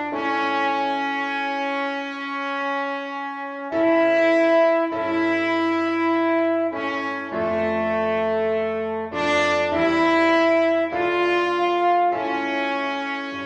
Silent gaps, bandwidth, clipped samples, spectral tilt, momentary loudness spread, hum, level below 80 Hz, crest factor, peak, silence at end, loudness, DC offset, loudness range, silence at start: none; 8.8 kHz; under 0.1%; -5 dB/octave; 9 LU; none; -58 dBFS; 14 dB; -8 dBFS; 0 s; -21 LUFS; under 0.1%; 4 LU; 0 s